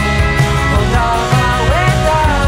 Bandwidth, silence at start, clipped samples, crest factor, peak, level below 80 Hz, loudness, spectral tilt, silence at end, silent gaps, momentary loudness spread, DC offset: 16 kHz; 0 s; under 0.1%; 10 dB; -2 dBFS; -18 dBFS; -13 LUFS; -5.5 dB/octave; 0 s; none; 1 LU; under 0.1%